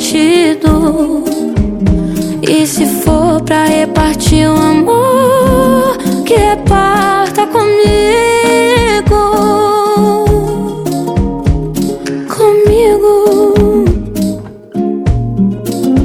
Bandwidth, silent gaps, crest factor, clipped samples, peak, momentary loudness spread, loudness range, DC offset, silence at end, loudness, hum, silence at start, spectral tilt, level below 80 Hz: 17 kHz; none; 10 dB; 0.3%; 0 dBFS; 7 LU; 2 LU; under 0.1%; 0 s; -10 LUFS; none; 0 s; -5.5 dB/octave; -22 dBFS